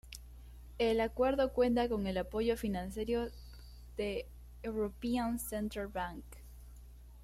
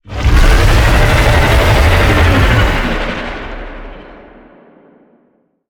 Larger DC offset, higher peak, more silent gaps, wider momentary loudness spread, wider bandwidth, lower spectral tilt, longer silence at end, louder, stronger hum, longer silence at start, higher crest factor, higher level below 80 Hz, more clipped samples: neither; second, -20 dBFS vs 0 dBFS; neither; first, 23 LU vs 17 LU; second, 16 kHz vs 19 kHz; about the same, -5.5 dB/octave vs -5.5 dB/octave; second, 0 s vs 1.55 s; second, -35 LUFS vs -11 LUFS; first, 60 Hz at -50 dBFS vs none; about the same, 0.05 s vs 0.1 s; first, 18 dB vs 12 dB; second, -50 dBFS vs -14 dBFS; neither